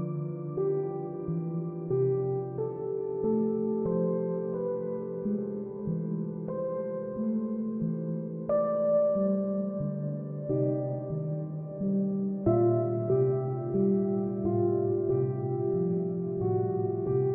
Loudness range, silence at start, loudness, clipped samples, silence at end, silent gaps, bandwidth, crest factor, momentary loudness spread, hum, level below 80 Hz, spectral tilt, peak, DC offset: 5 LU; 0 s; -30 LUFS; under 0.1%; 0 s; none; 2.5 kHz; 16 dB; 8 LU; none; -60 dBFS; -15 dB/octave; -14 dBFS; under 0.1%